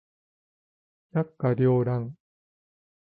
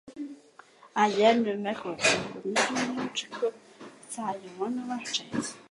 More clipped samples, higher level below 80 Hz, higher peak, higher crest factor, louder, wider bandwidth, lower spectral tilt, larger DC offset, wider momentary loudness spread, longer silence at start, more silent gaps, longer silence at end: neither; first, -60 dBFS vs -70 dBFS; second, -12 dBFS vs -8 dBFS; about the same, 16 dB vs 20 dB; about the same, -26 LUFS vs -28 LUFS; second, 4.5 kHz vs 11.5 kHz; first, -13 dB/octave vs -3 dB/octave; neither; second, 9 LU vs 19 LU; first, 1.15 s vs 0.05 s; neither; first, 1 s vs 0.1 s